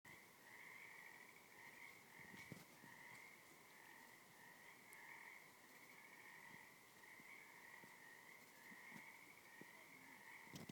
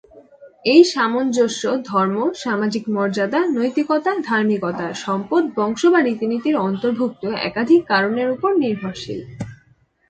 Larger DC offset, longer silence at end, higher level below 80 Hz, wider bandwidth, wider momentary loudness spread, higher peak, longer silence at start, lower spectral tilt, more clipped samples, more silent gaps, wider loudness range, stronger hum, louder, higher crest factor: neither; second, 0 s vs 0.55 s; second, under -90 dBFS vs -60 dBFS; first, 19 kHz vs 9 kHz; second, 5 LU vs 9 LU; second, -40 dBFS vs 0 dBFS; about the same, 0.05 s vs 0.15 s; second, -3 dB/octave vs -5 dB/octave; neither; neither; about the same, 1 LU vs 2 LU; neither; second, -61 LUFS vs -19 LUFS; about the same, 22 dB vs 18 dB